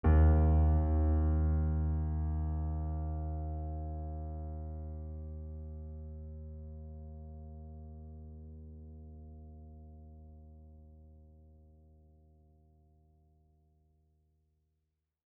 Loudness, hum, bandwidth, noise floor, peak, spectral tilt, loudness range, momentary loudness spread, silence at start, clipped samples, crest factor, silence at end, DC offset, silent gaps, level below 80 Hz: -34 LUFS; none; 2.5 kHz; -84 dBFS; -16 dBFS; -11.5 dB/octave; 24 LU; 24 LU; 0.05 s; under 0.1%; 20 dB; 4.05 s; under 0.1%; none; -38 dBFS